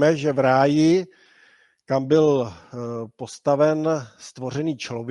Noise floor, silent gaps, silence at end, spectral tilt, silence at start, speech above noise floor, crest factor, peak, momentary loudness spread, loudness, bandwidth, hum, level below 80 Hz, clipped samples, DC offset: -57 dBFS; none; 0 s; -6.5 dB/octave; 0 s; 36 dB; 18 dB; -4 dBFS; 16 LU; -21 LUFS; 11 kHz; none; -64 dBFS; under 0.1%; under 0.1%